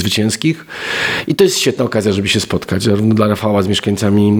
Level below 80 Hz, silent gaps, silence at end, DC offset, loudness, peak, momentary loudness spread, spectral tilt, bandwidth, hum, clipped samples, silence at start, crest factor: -46 dBFS; none; 0 s; under 0.1%; -14 LUFS; 0 dBFS; 5 LU; -5 dB/octave; 19 kHz; none; under 0.1%; 0 s; 14 dB